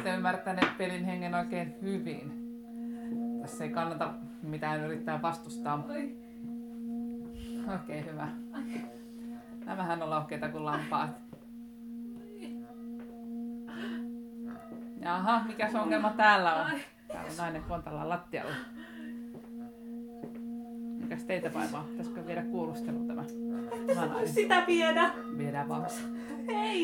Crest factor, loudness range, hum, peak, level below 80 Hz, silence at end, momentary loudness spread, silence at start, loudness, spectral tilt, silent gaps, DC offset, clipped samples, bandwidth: 24 dB; 11 LU; none; -10 dBFS; -62 dBFS; 0 s; 15 LU; 0 s; -34 LUFS; -5.5 dB/octave; none; under 0.1%; under 0.1%; 18.5 kHz